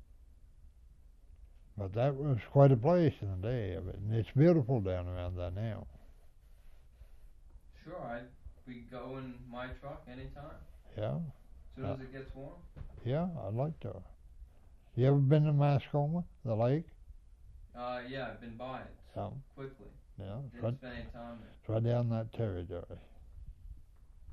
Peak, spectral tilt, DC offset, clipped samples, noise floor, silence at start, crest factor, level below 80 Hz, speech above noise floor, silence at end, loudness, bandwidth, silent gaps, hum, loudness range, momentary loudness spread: -14 dBFS; -10 dB/octave; under 0.1%; under 0.1%; -58 dBFS; 0 s; 22 dB; -54 dBFS; 25 dB; 0 s; -34 LUFS; 5.8 kHz; none; none; 16 LU; 24 LU